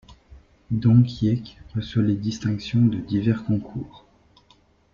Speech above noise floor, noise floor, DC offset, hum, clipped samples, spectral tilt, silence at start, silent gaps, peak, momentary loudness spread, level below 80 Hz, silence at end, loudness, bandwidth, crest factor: 37 dB; -58 dBFS; under 0.1%; none; under 0.1%; -8 dB/octave; 0.1 s; none; -4 dBFS; 14 LU; -50 dBFS; 0.95 s; -23 LUFS; 7.2 kHz; 18 dB